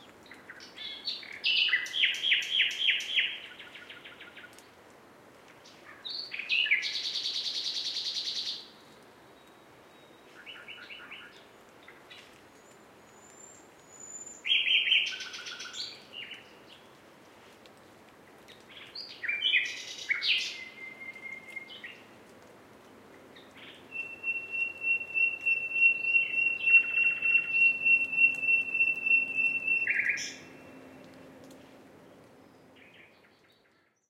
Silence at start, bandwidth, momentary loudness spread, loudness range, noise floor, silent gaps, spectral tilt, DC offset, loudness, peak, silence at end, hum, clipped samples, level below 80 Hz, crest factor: 0 s; 15.5 kHz; 23 LU; 23 LU; -68 dBFS; none; 0.5 dB/octave; under 0.1%; -26 LUFS; -12 dBFS; 1.1 s; none; under 0.1%; -80 dBFS; 20 dB